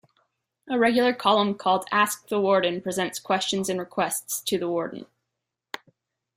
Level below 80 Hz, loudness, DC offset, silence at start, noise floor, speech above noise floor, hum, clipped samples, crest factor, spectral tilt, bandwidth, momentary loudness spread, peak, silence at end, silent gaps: -68 dBFS; -24 LUFS; under 0.1%; 0.65 s; -84 dBFS; 60 dB; none; under 0.1%; 20 dB; -3.5 dB/octave; 16 kHz; 14 LU; -6 dBFS; 1.35 s; none